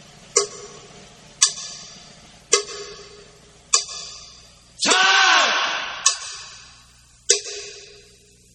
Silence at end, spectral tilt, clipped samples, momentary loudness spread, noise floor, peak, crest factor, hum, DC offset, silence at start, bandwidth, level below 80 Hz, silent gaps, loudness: 0.65 s; 1.5 dB/octave; under 0.1%; 24 LU; -52 dBFS; 0 dBFS; 24 dB; none; under 0.1%; 0.35 s; 12 kHz; -60 dBFS; none; -18 LUFS